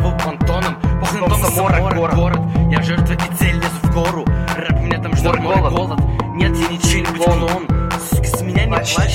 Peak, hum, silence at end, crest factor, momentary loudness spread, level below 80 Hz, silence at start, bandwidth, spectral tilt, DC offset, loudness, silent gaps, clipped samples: 0 dBFS; none; 0 s; 14 dB; 3 LU; -22 dBFS; 0 s; 16.5 kHz; -5.5 dB/octave; under 0.1%; -17 LUFS; none; under 0.1%